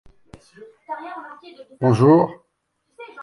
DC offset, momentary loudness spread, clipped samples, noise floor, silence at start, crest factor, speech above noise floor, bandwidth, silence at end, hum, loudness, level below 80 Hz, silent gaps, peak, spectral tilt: under 0.1%; 26 LU; under 0.1%; -72 dBFS; 0.6 s; 20 dB; 53 dB; 11 kHz; 0 s; none; -17 LUFS; -58 dBFS; none; -2 dBFS; -9 dB/octave